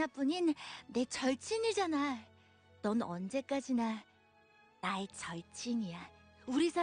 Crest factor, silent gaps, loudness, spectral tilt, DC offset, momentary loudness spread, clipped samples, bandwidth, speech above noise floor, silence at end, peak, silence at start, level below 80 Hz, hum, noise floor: 16 dB; none; -37 LUFS; -4.5 dB/octave; under 0.1%; 11 LU; under 0.1%; 10 kHz; 31 dB; 0 s; -22 dBFS; 0 s; -74 dBFS; none; -67 dBFS